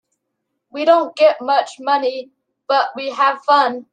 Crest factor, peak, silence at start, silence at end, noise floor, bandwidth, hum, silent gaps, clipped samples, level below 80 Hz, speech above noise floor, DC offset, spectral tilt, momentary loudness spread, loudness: 16 dB; -2 dBFS; 0.75 s; 0.1 s; -75 dBFS; 9.4 kHz; none; none; under 0.1%; -78 dBFS; 59 dB; under 0.1%; -2.5 dB/octave; 9 LU; -16 LUFS